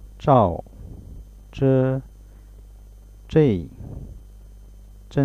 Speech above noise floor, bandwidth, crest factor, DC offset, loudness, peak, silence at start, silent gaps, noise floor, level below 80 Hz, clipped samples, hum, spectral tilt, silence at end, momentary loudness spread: 25 dB; 9 kHz; 20 dB; under 0.1%; -21 LUFS; -4 dBFS; 0.05 s; none; -44 dBFS; -42 dBFS; under 0.1%; 50 Hz at -45 dBFS; -9.5 dB/octave; 0 s; 24 LU